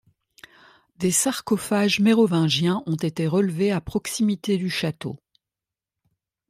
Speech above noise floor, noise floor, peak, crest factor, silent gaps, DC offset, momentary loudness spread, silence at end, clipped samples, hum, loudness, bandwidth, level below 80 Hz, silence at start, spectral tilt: 67 dB; -89 dBFS; -8 dBFS; 16 dB; none; under 0.1%; 9 LU; 1.35 s; under 0.1%; none; -22 LUFS; 16 kHz; -56 dBFS; 1 s; -4.5 dB/octave